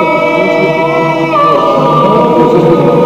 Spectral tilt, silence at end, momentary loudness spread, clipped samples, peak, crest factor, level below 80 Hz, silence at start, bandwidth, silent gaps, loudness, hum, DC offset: -7.5 dB/octave; 0 s; 3 LU; 0.4%; 0 dBFS; 8 dB; -46 dBFS; 0 s; 15.5 kHz; none; -8 LUFS; none; 0.6%